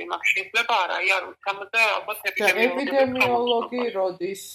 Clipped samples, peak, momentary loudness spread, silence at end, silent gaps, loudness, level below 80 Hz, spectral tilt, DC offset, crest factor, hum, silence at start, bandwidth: under 0.1%; -6 dBFS; 7 LU; 0 s; none; -22 LUFS; -68 dBFS; -2.5 dB/octave; under 0.1%; 18 dB; none; 0 s; 16 kHz